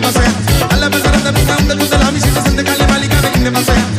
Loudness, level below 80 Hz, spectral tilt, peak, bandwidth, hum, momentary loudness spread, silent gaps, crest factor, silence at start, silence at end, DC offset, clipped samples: -12 LUFS; -18 dBFS; -4.5 dB/octave; -2 dBFS; 15.5 kHz; none; 1 LU; none; 10 dB; 0 s; 0 s; under 0.1%; under 0.1%